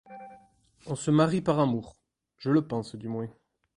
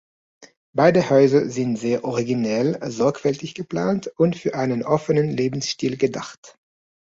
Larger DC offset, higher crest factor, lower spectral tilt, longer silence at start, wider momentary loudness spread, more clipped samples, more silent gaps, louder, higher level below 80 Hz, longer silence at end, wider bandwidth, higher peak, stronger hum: neither; about the same, 20 dB vs 18 dB; about the same, -7 dB/octave vs -6 dB/octave; second, 0.1 s vs 0.4 s; first, 16 LU vs 9 LU; neither; second, none vs 0.57-0.73 s, 6.37-6.43 s; second, -28 LUFS vs -21 LUFS; about the same, -62 dBFS vs -60 dBFS; second, 0.45 s vs 0.6 s; first, 11 kHz vs 8 kHz; second, -10 dBFS vs -2 dBFS; neither